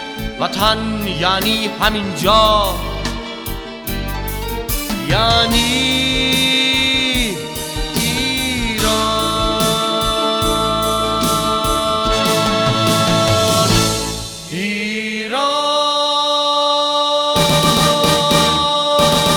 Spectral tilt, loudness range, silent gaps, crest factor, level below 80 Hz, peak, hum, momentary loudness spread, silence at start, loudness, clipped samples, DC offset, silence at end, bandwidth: -3.5 dB/octave; 4 LU; none; 16 dB; -30 dBFS; 0 dBFS; none; 10 LU; 0 s; -15 LUFS; under 0.1%; under 0.1%; 0 s; over 20 kHz